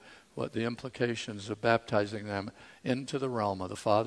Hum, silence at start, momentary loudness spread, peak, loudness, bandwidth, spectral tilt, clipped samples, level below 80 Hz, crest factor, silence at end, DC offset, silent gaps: none; 0.05 s; 10 LU; -10 dBFS; -33 LUFS; 11 kHz; -5.5 dB/octave; under 0.1%; -68 dBFS; 22 dB; 0 s; under 0.1%; none